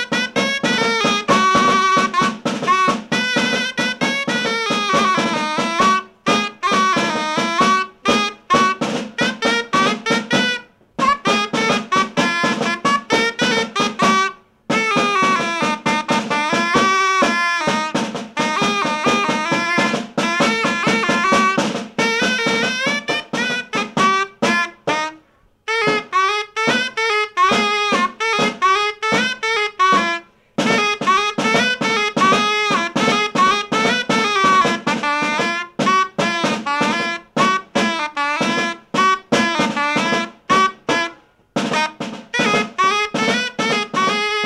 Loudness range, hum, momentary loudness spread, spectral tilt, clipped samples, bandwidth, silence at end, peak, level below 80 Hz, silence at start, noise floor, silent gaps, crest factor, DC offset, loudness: 3 LU; none; 6 LU; -3 dB/octave; under 0.1%; 15 kHz; 0 s; -4 dBFS; -56 dBFS; 0 s; -54 dBFS; none; 14 dB; under 0.1%; -17 LUFS